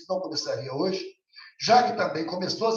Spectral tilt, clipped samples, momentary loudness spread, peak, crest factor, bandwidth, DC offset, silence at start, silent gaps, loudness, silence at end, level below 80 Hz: -4 dB/octave; under 0.1%; 11 LU; -6 dBFS; 20 dB; 7.6 kHz; under 0.1%; 0 s; none; -26 LUFS; 0 s; -74 dBFS